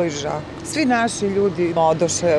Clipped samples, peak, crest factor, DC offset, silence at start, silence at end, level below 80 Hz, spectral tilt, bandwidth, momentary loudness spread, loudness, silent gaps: under 0.1%; -6 dBFS; 14 dB; under 0.1%; 0 s; 0 s; -48 dBFS; -4.5 dB/octave; 13 kHz; 9 LU; -20 LUFS; none